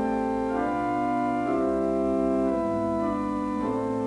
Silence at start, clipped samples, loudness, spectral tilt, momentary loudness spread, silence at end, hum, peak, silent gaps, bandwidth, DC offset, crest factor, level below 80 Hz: 0 s; under 0.1%; -26 LUFS; -8 dB/octave; 3 LU; 0 s; none; -14 dBFS; none; 11 kHz; under 0.1%; 12 dB; -48 dBFS